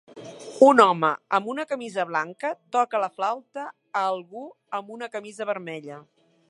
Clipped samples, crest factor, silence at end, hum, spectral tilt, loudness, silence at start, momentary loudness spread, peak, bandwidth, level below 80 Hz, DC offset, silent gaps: under 0.1%; 24 dB; 0.5 s; none; -5 dB/octave; -24 LUFS; 0.15 s; 23 LU; 0 dBFS; 11.5 kHz; -82 dBFS; under 0.1%; none